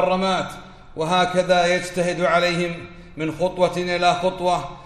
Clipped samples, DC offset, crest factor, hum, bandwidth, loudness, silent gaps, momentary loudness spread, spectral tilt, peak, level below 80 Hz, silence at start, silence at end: under 0.1%; under 0.1%; 16 dB; none; 13.5 kHz; -21 LUFS; none; 13 LU; -4.5 dB/octave; -4 dBFS; -46 dBFS; 0 s; 0 s